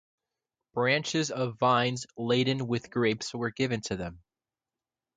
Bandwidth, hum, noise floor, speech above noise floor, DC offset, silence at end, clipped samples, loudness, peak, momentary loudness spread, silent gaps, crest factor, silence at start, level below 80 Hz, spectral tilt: 9.4 kHz; none; under -90 dBFS; over 61 dB; under 0.1%; 1 s; under 0.1%; -29 LUFS; -12 dBFS; 10 LU; none; 18 dB; 0.75 s; -62 dBFS; -5 dB/octave